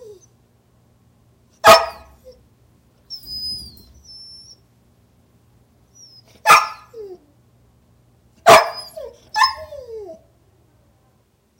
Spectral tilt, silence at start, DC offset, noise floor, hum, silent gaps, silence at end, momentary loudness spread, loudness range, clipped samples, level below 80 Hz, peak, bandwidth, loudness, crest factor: -1.5 dB/octave; 1.65 s; under 0.1%; -60 dBFS; none; none; 1.5 s; 27 LU; 16 LU; under 0.1%; -54 dBFS; 0 dBFS; 16.5 kHz; -15 LUFS; 22 dB